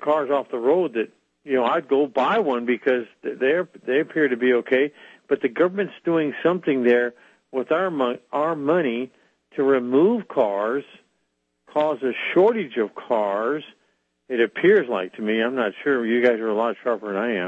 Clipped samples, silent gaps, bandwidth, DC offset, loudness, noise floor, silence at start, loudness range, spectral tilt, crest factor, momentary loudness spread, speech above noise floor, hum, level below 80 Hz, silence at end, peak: under 0.1%; none; 7.4 kHz; under 0.1%; -22 LUFS; -73 dBFS; 0 s; 2 LU; -7.5 dB/octave; 16 dB; 8 LU; 52 dB; none; -78 dBFS; 0 s; -6 dBFS